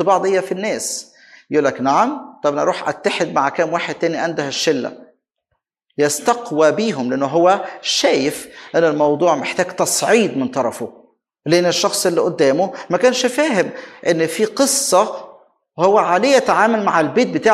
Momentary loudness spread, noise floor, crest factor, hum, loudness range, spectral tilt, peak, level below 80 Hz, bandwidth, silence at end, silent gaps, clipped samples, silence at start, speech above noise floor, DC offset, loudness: 8 LU; -73 dBFS; 16 dB; none; 4 LU; -3.5 dB/octave; 0 dBFS; -64 dBFS; 16 kHz; 0 s; none; under 0.1%; 0 s; 56 dB; under 0.1%; -17 LUFS